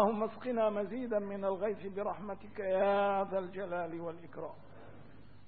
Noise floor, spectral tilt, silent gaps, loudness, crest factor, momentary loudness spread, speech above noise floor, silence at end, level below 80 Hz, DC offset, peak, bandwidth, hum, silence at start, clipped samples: -57 dBFS; -5.5 dB/octave; none; -35 LUFS; 20 dB; 16 LU; 22 dB; 0.1 s; -68 dBFS; 0.3%; -16 dBFS; 4.6 kHz; 50 Hz at -65 dBFS; 0 s; under 0.1%